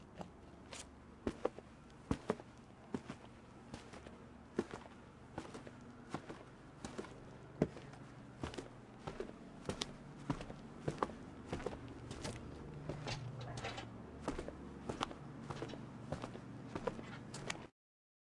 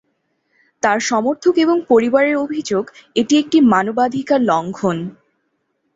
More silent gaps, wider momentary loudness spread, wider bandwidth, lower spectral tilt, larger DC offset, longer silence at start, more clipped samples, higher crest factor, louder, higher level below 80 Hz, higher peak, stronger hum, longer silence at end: neither; first, 12 LU vs 9 LU; first, 11.5 kHz vs 8 kHz; about the same, -5.5 dB/octave vs -5 dB/octave; neither; second, 0 s vs 0.85 s; neither; first, 30 dB vs 16 dB; second, -47 LUFS vs -16 LUFS; about the same, -62 dBFS vs -60 dBFS; second, -16 dBFS vs -2 dBFS; neither; second, 0.6 s vs 0.85 s